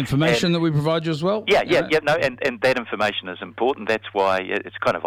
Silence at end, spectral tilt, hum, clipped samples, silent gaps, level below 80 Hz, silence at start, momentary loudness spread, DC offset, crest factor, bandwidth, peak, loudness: 0 s; -5.5 dB/octave; none; under 0.1%; none; -52 dBFS; 0 s; 6 LU; under 0.1%; 16 dB; 16 kHz; -6 dBFS; -21 LUFS